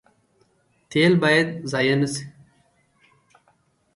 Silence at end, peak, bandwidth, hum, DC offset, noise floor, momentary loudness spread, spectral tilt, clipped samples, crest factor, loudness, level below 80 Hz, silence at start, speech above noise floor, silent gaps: 1.65 s; -4 dBFS; 11.5 kHz; none; under 0.1%; -64 dBFS; 12 LU; -5.5 dB/octave; under 0.1%; 20 dB; -20 LUFS; -64 dBFS; 0.9 s; 44 dB; none